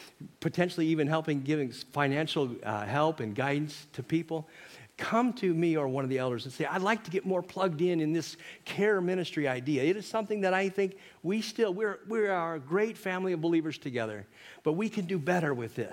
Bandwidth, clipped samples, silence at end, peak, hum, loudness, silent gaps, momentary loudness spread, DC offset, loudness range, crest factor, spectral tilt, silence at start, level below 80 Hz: 16.5 kHz; under 0.1%; 0 s; -12 dBFS; none; -31 LUFS; none; 9 LU; under 0.1%; 2 LU; 20 dB; -6 dB/octave; 0 s; -76 dBFS